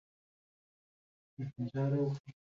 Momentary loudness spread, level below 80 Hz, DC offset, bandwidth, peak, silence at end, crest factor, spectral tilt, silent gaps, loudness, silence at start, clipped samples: 12 LU; -74 dBFS; under 0.1%; 7 kHz; -24 dBFS; 0.1 s; 16 dB; -9.5 dB/octave; 2.20-2.24 s; -36 LUFS; 1.4 s; under 0.1%